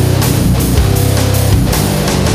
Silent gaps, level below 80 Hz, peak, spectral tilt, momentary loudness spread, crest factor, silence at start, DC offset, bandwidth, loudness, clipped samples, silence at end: none; -18 dBFS; 0 dBFS; -5.5 dB/octave; 1 LU; 10 dB; 0 s; under 0.1%; 16 kHz; -12 LUFS; under 0.1%; 0 s